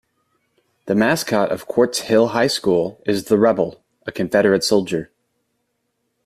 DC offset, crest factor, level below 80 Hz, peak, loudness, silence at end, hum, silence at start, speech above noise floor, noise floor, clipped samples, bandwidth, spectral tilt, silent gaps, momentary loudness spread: under 0.1%; 18 dB; -58 dBFS; -2 dBFS; -18 LUFS; 1.2 s; none; 0.85 s; 54 dB; -72 dBFS; under 0.1%; 15 kHz; -4.5 dB/octave; none; 10 LU